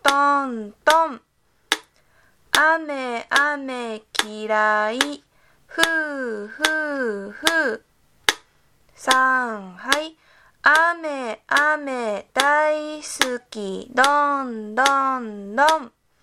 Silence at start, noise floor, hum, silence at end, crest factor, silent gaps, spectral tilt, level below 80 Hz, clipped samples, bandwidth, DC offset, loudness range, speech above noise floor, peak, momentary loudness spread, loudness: 0.05 s; -64 dBFS; none; 0.35 s; 22 dB; none; -1.5 dB/octave; -62 dBFS; under 0.1%; 17 kHz; under 0.1%; 3 LU; 43 dB; 0 dBFS; 12 LU; -21 LUFS